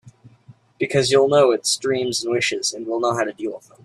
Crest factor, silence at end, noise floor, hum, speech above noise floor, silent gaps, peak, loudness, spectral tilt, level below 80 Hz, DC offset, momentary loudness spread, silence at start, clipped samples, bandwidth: 18 dB; 0.25 s; -50 dBFS; none; 30 dB; none; -4 dBFS; -20 LUFS; -3.5 dB/octave; -62 dBFS; under 0.1%; 10 LU; 0.05 s; under 0.1%; 13 kHz